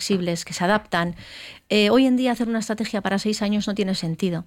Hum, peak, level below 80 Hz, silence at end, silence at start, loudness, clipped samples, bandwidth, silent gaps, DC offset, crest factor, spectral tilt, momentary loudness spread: none; -6 dBFS; -54 dBFS; 0.05 s; 0 s; -22 LUFS; under 0.1%; 16 kHz; none; under 0.1%; 16 dB; -5 dB/octave; 9 LU